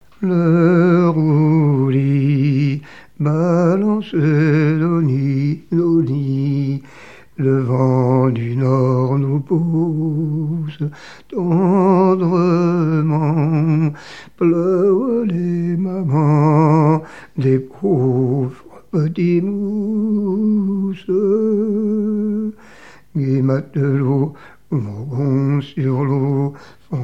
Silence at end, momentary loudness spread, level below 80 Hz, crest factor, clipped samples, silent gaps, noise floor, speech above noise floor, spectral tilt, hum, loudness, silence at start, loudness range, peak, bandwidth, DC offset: 0 s; 9 LU; -58 dBFS; 16 dB; under 0.1%; none; -44 dBFS; 30 dB; -10 dB/octave; none; -17 LUFS; 0.2 s; 3 LU; -2 dBFS; 7.2 kHz; 0.5%